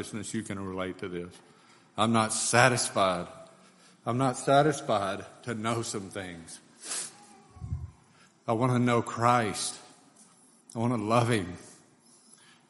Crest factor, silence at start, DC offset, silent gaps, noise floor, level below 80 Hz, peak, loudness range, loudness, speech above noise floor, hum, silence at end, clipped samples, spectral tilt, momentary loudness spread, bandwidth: 26 dB; 0 s; under 0.1%; none; -60 dBFS; -60 dBFS; -4 dBFS; 8 LU; -28 LUFS; 32 dB; none; 0.95 s; under 0.1%; -4.5 dB/octave; 18 LU; 11.5 kHz